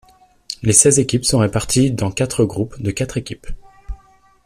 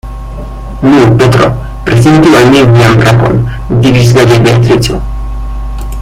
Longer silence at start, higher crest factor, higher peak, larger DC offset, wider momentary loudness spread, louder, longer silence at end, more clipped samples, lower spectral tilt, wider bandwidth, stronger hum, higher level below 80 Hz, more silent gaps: first, 0.5 s vs 0.05 s; first, 18 dB vs 6 dB; about the same, 0 dBFS vs 0 dBFS; neither; first, 22 LU vs 16 LU; second, -16 LUFS vs -6 LUFS; first, 0.5 s vs 0 s; second, under 0.1% vs 1%; second, -4.5 dB/octave vs -6.5 dB/octave; about the same, 15.5 kHz vs 15 kHz; neither; second, -38 dBFS vs -20 dBFS; neither